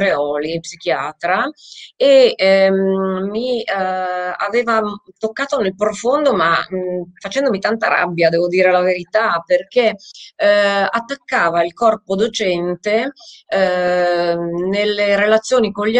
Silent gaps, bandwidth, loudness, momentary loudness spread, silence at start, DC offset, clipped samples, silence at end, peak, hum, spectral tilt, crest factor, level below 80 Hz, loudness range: none; 9.4 kHz; -16 LUFS; 9 LU; 0 s; under 0.1%; under 0.1%; 0 s; 0 dBFS; none; -4.5 dB/octave; 16 dB; -58 dBFS; 3 LU